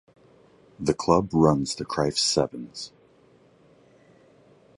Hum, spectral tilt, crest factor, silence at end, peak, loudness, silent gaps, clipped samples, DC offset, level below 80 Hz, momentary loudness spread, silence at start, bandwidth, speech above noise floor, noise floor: none; -5 dB/octave; 22 dB; 1.9 s; -4 dBFS; -24 LUFS; none; under 0.1%; under 0.1%; -52 dBFS; 16 LU; 0.8 s; 11.5 kHz; 34 dB; -58 dBFS